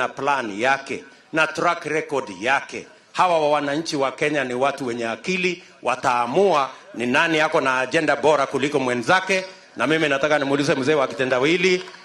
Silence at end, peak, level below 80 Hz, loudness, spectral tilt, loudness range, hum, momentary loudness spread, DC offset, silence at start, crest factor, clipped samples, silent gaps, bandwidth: 0 s; -4 dBFS; -64 dBFS; -21 LUFS; -4 dB/octave; 3 LU; none; 8 LU; under 0.1%; 0 s; 18 dB; under 0.1%; none; 12.5 kHz